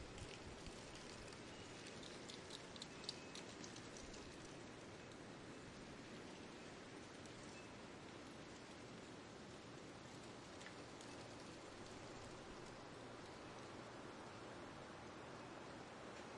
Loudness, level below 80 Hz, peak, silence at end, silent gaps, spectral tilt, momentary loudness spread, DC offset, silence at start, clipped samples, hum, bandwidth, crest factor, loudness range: -55 LUFS; -72 dBFS; -30 dBFS; 0 s; none; -4 dB/octave; 3 LU; under 0.1%; 0 s; under 0.1%; none; 12 kHz; 26 dB; 3 LU